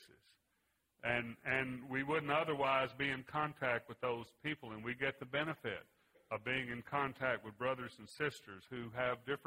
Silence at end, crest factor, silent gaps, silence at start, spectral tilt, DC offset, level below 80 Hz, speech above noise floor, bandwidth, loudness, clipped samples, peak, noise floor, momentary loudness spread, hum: 0.1 s; 20 dB; none; 0 s; -5.5 dB/octave; under 0.1%; -72 dBFS; 41 dB; 16 kHz; -39 LUFS; under 0.1%; -20 dBFS; -81 dBFS; 9 LU; none